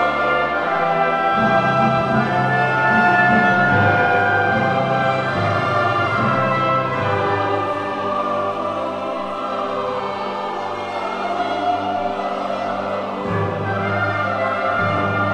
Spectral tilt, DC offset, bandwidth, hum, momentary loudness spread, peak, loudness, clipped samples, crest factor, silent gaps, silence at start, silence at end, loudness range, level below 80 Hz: -6.5 dB/octave; 0.2%; 9.8 kHz; none; 9 LU; -2 dBFS; -19 LUFS; under 0.1%; 16 dB; none; 0 s; 0 s; 7 LU; -52 dBFS